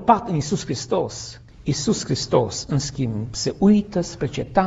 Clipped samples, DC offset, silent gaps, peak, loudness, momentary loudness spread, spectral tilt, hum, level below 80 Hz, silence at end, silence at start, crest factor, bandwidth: under 0.1%; under 0.1%; none; -2 dBFS; -22 LUFS; 9 LU; -5.5 dB/octave; none; -44 dBFS; 0 s; 0 s; 20 dB; 8 kHz